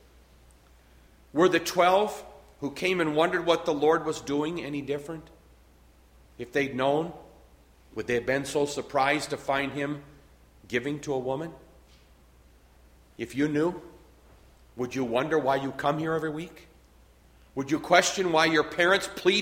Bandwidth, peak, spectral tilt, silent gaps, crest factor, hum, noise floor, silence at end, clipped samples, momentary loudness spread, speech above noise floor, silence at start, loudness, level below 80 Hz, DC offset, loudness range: 16.5 kHz; -6 dBFS; -4 dB/octave; none; 22 dB; none; -57 dBFS; 0 s; under 0.1%; 15 LU; 31 dB; 1.35 s; -27 LUFS; -58 dBFS; under 0.1%; 8 LU